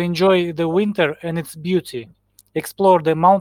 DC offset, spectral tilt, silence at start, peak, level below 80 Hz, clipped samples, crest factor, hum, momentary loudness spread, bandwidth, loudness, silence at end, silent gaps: under 0.1%; -6 dB/octave; 0 s; -2 dBFS; -58 dBFS; under 0.1%; 16 dB; none; 13 LU; 16.5 kHz; -18 LUFS; 0 s; none